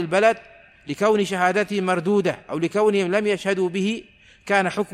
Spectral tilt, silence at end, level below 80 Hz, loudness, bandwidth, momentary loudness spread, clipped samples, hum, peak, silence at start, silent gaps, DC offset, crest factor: -5.5 dB/octave; 0 s; -62 dBFS; -21 LUFS; 13.5 kHz; 7 LU; under 0.1%; none; -6 dBFS; 0 s; none; under 0.1%; 16 dB